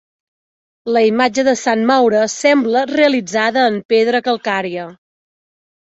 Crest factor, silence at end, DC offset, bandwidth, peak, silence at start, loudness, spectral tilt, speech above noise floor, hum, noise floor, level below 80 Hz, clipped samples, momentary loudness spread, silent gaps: 14 dB; 1 s; under 0.1%; 8.2 kHz; -2 dBFS; 0.85 s; -15 LUFS; -3.5 dB/octave; over 76 dB; none; under -90 dBFS; -62 dBFS; under 0.1%; 7 LU; 3.85-3.89 s